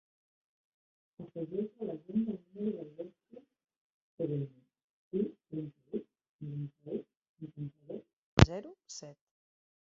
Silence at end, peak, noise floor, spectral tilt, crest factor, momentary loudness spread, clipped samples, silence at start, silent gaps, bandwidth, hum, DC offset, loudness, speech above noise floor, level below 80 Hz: 0.8 s; -2 dBFS; -59 dBFS; -6.5 dB/octave; 36 dB; 18 LU; under 0.1%; 1.2 s; 3.78-4.18 s, 4.84-5.11 s, 6.29-6.39 s, 7.17-7.21 s, 7.29-7.35 s, 8.13-8.37 s; 7 kHz; none; under 0.1%; -36 LUFS; 20 dB; -48 dBFS